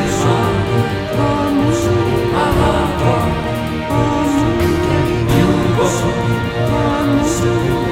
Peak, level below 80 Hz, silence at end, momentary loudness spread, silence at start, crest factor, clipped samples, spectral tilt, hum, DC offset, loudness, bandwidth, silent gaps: 0 dBFS; -28 dBFS; 0 s; 3 LU; 0 s; 14 dB; under 0.1%; -6 dB/octave; none; under 0.1%; -15 LUFS; 16.5 kHz; none